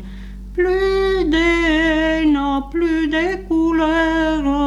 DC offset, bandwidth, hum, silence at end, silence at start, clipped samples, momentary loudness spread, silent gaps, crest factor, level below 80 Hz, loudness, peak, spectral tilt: under 0.1%; 10.5 kHz; none; 0 s; 0 s; under 0.1%; 5 LU; none; 10 dB; -32 dBFS; -17 LUFS; -6 dBFS; -5.5 dB/octave